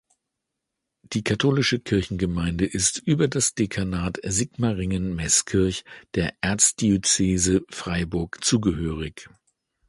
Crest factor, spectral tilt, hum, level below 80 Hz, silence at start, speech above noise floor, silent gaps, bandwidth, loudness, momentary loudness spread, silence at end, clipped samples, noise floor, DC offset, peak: 22 dB; -4 dB/octave; none; -42 dBFS; 1.1 s; 59 dB; none; 11.5 kHz; -23 LUFS; 9 LU; 0.6 s; under 0.1%; -82 dBFS; under 0.1%; -4 dBFS